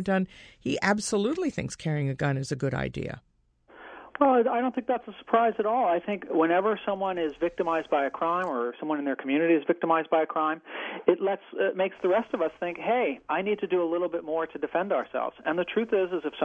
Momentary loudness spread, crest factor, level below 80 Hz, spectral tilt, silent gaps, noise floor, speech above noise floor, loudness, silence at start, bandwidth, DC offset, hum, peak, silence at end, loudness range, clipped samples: 8 LU; 20 dB; -60 dBFS; -6 dB/octave; none; -59 dBFS; 32 dB; -27 LUFS; 0 s; 10.5 kHz; under 0.1%; none; -6 dBFS; 0 s; 3 LU; under 0.1%